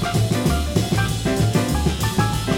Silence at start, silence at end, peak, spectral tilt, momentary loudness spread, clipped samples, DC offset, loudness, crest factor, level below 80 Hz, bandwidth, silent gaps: 0 s; 0 s; -4 dBFS; -5.5 dB/octave; 2 LU; under 0.1%; 0.2%; -20 LUFS; 14 dB; -28 dBFS; 16.5 kHz; none